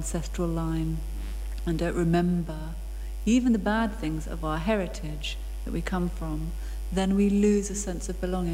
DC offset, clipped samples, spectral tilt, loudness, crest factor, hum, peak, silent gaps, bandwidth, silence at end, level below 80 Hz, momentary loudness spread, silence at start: under 0.1%; under 0.1%; -6 dB/octave; -28 LUFS; 16 dB; none; -12 dBFS; none; 16 kHz; 0 s; -34 dBFS; 13 LU; 0 s